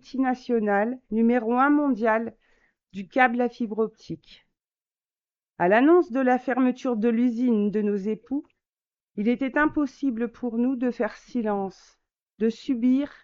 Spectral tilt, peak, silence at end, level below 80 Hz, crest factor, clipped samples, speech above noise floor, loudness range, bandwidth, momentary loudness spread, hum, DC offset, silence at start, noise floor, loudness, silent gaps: -7.5 dB/octave; -6 dBFS; 0.15 s; -60 dBFS; 20 dB; under 0.1%; over 66 dB; 5 LU; 7 kHz; 10 LU; none; under 0.1%; 0.1 s; under -90 dBFS; -24 LUFS; 8.69-8.73 s, 12.22-12.26 s